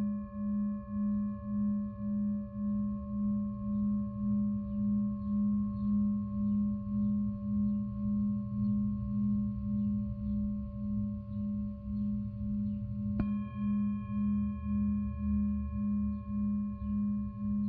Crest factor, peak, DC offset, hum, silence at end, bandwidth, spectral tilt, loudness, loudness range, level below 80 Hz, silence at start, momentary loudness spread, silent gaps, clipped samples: 14 dB; -20 dBFS; under 0.1%; none; 0 s; 2.6 kHz; -12 dB/octave; -34 LUFS; 3 LU; -46 dBFS; 0 s; 4 LU; none; under 0.1%